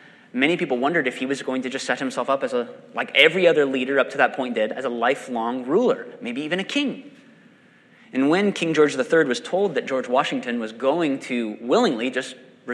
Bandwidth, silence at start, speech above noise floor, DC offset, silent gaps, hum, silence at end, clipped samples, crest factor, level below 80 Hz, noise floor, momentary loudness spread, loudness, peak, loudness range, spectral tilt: 12 kHz; 0.35 s; 32 dB; under 0.1%; none; none; 0 s; under 0.1%; 22 dB; -78 dBFS; -53 dBFS; 10 LU; -22 LUFS; 0 dBFS; 4 LU; -4.5 dB/octave